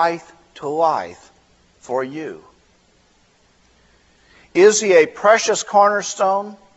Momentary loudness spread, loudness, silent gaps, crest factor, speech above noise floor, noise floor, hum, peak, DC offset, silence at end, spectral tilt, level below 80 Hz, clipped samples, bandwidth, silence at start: 18 LU; -17 LUFS; none; 18 dB; 40 dB; -57 dBFS; none; 0 dBFS; under 0.1%; 0.2 s; -3 dB/octave; -64 dBFS; under 0.1%; 8.2 kHz; 0 s